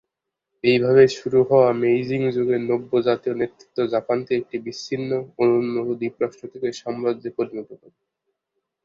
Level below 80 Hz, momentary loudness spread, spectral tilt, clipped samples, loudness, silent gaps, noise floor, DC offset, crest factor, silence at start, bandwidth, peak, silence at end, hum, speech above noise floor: -62 dBFS; 12 LU; -6.5 dB/octave; under 0.1%; -21 LUFS; none; -82 dBFS; under 0.1%; 18 dB; 0.65 s; 7.4 kHz; -2 dBFS; 1.1 s; none; 61 dB